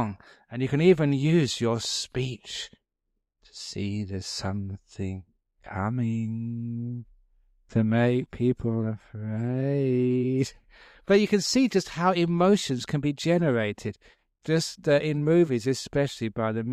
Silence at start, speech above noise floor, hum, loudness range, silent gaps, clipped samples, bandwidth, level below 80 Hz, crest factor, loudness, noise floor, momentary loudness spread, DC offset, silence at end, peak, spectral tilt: 0 s; 55 dB; none; 9 LU; none; under 0.1%; 14 kHz; -56 dBFS; 18 dB; -26 LUFS; -80 dBFS; 14 LU; under 0.1%; 0 s; -8 dBFS; -6 dB/octave